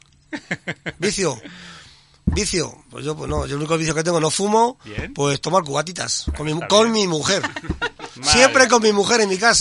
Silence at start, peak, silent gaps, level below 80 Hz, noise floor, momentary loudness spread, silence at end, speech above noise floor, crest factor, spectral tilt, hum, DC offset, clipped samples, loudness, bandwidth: 0.3 s; 0 dBFS; none; -38 dBFS; -47 dBFS; 16 LU; 0 s; 28 dB; 20 dB; -3 dB/octave; none; under 0.1%; under 0.1%; -19 LUFS; 11.5 kHz